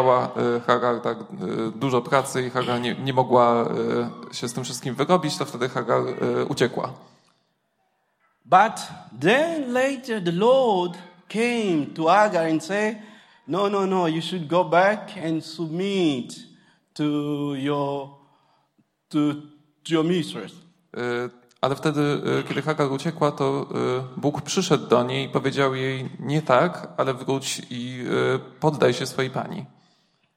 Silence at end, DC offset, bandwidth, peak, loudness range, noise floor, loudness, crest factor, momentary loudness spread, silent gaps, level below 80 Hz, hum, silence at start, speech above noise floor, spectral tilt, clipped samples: 0.7 s; under 0.1%; 16 kHz; -2 dBFS; 6 LU; -71 dBFS; -23 LUFS; 22 dB; 12 LU; none; -68 dBFS; none; 0 s; 48 dB; -5.5 dB/octave; under 0.1%